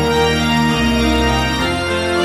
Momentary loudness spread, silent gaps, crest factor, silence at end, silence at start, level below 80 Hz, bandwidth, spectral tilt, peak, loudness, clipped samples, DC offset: 3 LU; none; 12 dB; 0 s; 0 s; -26 dBFS; 16 kHz; -5 dB/octave; -2 dBFS; -15 LUFS; under 0.1%; under 0.1%